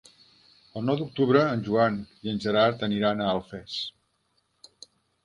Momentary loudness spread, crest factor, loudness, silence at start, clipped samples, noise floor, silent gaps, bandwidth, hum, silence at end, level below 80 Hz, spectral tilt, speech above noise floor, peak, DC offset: 11 LU; 20 dB; -26 LUFS; 0.75 s; under 0.1%; -72 dBFS; none; 11 kHz; none; 1.35 s; -62 dBFS; -7 dB/octave; 47 dB; -8 dBFS; under 0.1%